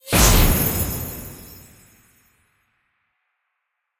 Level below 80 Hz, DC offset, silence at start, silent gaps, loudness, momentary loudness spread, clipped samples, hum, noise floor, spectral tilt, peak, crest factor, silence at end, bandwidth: -26 dBFS; under 0.1%; 0.05 s; none; -18 LUFS; 24 LU; under 0.1%; none; -77 dBFS; -3.5 dB/octave; -2 dBFS; 20 dB; 2.55 s; 16.5 kHz